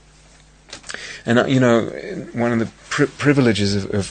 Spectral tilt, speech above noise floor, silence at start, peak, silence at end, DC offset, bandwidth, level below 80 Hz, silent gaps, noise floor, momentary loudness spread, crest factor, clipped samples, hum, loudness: -6 dB/octave; 31 dB; 0.7 s; 0 dBFS; 0 s; under 0.1%; 9.6 kHz; -50 dBFS; none; -49 dBFS; 16 LU; 20 dB; under 0.1%; none; -19 LUFS